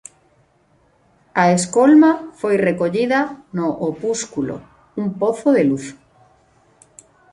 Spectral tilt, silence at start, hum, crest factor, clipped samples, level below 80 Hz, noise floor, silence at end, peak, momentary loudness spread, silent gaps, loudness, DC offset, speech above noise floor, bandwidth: -5.5 dB/octave; 1.35 s; none; 16 dB; under 0.1%; -60 dBFS; -58 dBFS; 1.4 s; -2 dBFS; 14 LU; none; -18 LUFS; under 0.1%; 41 dB; 11.5 kHz